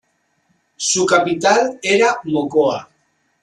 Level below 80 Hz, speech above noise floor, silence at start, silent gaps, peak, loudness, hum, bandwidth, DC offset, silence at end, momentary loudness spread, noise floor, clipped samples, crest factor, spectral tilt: -62 dBFS; 48 dB; 0.8 s; none; -2 dBFS; -16 LUFS; none; 11.5 kHz; under 0.1%; 0.6 s; 6 LU; -64 dBFS; under 0.1%; 16 dB; -3 dB/octave